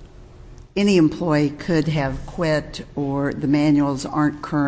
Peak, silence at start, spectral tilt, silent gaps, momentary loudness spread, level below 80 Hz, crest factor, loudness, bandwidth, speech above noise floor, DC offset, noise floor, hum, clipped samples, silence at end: -6 dBFS; 0 s; -7 dB/octave; none; 9 LU; -42 dBFS; 16 dB; -21 LUFS; 8 kHz; 22 dB; under 0.1%; -42 dBFS; none; under 0.1%; 0 s